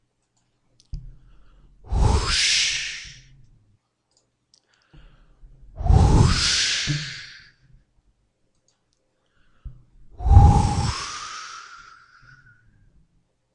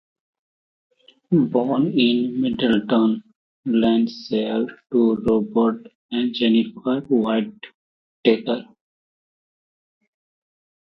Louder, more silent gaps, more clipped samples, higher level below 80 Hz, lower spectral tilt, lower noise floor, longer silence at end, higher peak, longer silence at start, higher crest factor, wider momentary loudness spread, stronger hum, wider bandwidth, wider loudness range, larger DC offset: about the same, -20 LUFS vs -21 LUFS; second, none vs 3.36-3.63 s, 5.95-6.09 s, 7.74-8.23 s; neither; first, -28 dBFS vs -58 dBFS; second, -4 dB/octave vs -8 dB/octave; second, -70 dBFS vs under -90 dBFS; second, 1.8 s vs 2.35 s; about the same, 0 dBFS vs -2 dBFS; second, 0.95 s vs 1.3 s; about the same, 24 dB vs 20 dB; first, 25 LU vs 7 LU; neither; first, 11 kHz vs 6 kHz; about the same, 7 LU vs 5 LU; neither